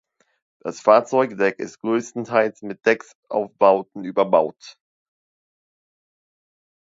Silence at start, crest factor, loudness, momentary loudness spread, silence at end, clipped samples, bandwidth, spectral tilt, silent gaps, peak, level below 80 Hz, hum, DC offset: 0.65 s; 22 dB; -20 LUFS; 11 LU; 2.15 s; under 0.1%; 7.8 kHz; -5.5 dB/octave; 3.15-3.23 s; 0 dBFS; -72 dBFS; none; under 0.1%